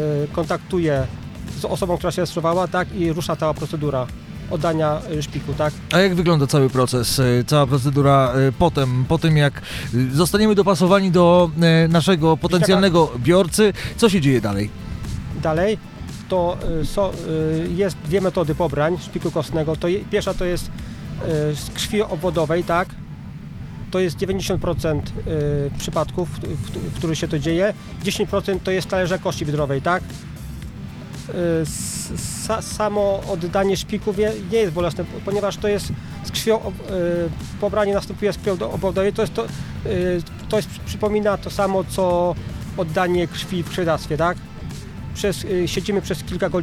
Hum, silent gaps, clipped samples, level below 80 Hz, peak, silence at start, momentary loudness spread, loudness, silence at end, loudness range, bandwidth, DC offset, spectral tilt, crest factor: none; none; under 0.1%; -38 dBFS; 0 dBFS; 0 s; 13 LU; -20 LUFS; 0 s; 7 LU; 16 kHz; under 0.1%; -6 dB/octave; 20 dB